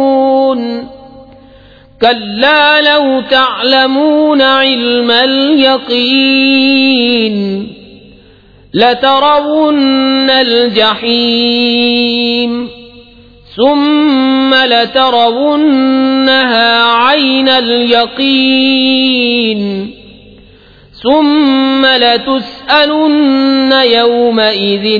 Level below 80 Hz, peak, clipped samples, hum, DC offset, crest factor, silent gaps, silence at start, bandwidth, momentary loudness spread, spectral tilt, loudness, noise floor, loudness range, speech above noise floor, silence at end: -48 dBFS; 0 dBFS; 0.1%; none; 0.2%; 10 dB; none; 0 s; 5.4 kHz; 6 LU; -6 dB/octave; -8 LUFS; -40 dBFS; 3 LU; 32 dB; 0 s